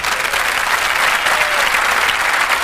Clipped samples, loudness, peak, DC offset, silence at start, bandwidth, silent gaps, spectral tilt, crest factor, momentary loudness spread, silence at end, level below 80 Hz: under 0.1%; -14 LUFS; -2 dBFS; under 0.1%; 0 s; 16 kHz; none; 0.5 dB/octave; 12 dB; 2 LU; 0 s; -42 dBFS